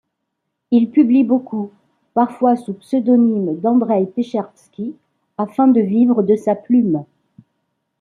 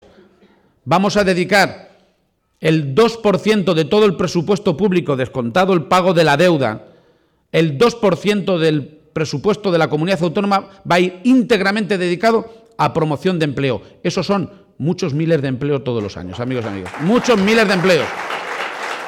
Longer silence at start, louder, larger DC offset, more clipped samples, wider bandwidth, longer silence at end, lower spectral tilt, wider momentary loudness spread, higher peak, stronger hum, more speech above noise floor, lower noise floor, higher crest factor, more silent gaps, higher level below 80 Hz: second, 0.7 s vs 0.85 s; about the same, -16 LUFS vs -16 LUFS; neither; neither; second, 4.4 kHz vs 17 kHz; first, 0.95 s vs 0 s; first, -9.5 dB/octave vs -6 dB/octave; first, 15 LU vs 10 LU; first, -2 dBFS vs -6 dBFS; neither; first, 60 dB vs 48 dB; first, -75 dBFS vs -63 dBFS; about the same, 14 dB vs 12 dB; neither; second, -68 dBFS vs -50 dBFS